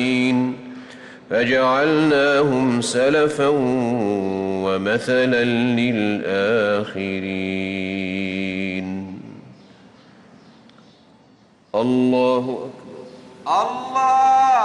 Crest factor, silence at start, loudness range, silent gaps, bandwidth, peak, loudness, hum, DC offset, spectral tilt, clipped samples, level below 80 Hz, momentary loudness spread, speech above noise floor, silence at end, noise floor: 12 dB; 0 s; 11 LU; none; 11 kHz; -8 dBFS; -19 LUFS; none; under 0.1%; -5.5 dB/octave; under 0.1%; -60 dBFS; 17 LU; 34 dB; 0 s; -53 dBFS